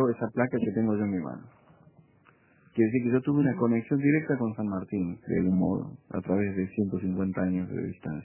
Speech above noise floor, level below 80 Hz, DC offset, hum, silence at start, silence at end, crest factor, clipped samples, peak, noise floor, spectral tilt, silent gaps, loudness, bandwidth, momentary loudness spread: 34 dB; -56 dBFS; under 0.1%; none; 0 s; 0 s; 18 dB; under 0.1%; -10 dBFS; -61 dBFS; -10 dB/octave; none; -28 LUFS; 3.2 kHz; 9 LU